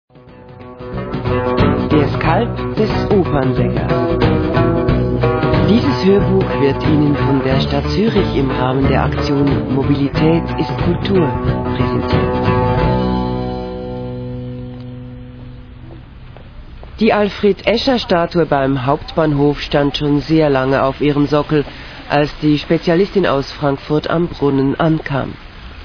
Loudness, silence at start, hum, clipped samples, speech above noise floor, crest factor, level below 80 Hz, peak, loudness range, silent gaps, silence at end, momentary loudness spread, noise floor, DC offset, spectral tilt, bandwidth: -15 LUFS; 0.25 s; none; under 0.1%; 24 dB; 16 dB; -30 dBFS; 0 dBFS; 6 LU; none; 0 s; 12 LU; -38 dBFS; under 0.1%; -8 dB/octave; 5.4 kHz